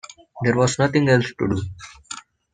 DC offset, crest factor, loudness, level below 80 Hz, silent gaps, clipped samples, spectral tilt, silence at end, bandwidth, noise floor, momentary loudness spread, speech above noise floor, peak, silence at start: under 0.1%; 18 dB; -20 LUFS; -52 dBFS; none; under 0.1%; -5.5 dB/octave; 0.35 s; 9.6 kHz; -40 dBFS; 18 LU; 20 dB; -4 dBFS; 0.35 s